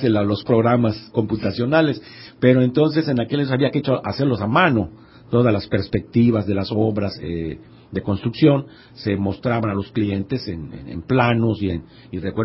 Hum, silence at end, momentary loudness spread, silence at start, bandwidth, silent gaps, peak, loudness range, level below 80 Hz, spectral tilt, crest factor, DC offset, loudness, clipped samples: none; 0 s; 14 LU; 0 s; 5.8 kHz; none; -2 dBFS; 3 LU; -44 dBFS; -11.5 dB/octave; 18 dB; under 0.1%; -20 LUFS; under 0.1%